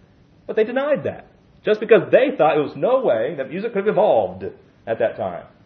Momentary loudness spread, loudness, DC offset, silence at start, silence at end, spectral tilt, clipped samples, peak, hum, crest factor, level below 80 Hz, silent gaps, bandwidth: 13 LU; -19 LUFS; under 0.1%; 0.5 s; 0.2 s; -8.5 dB/octave; under 0.1%; 0 dBFS; none; 20 dB; -62 dBFS; none; 5.6 kHz